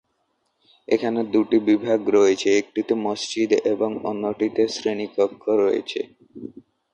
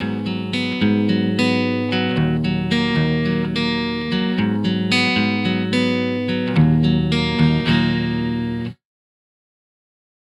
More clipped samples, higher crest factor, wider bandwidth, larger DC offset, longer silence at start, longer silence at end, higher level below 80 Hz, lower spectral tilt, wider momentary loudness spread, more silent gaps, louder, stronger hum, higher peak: neither; about the same, 16 dB vs 16 dB; second, 9 kHz vs 11.5 kHz; neither; first, 0.9 s vs 0 s; second, 0.45 s vs 1.5 s; second, -66 dBFS vs -42 dBFS; second, -4.5 dB/octave vs -6.5 dB/octave; first, 12 LU vs 6 LU; neither; second, -22 LUFS vs -19 LUFS; neither; second, -6 dBFS vs -2 dBFS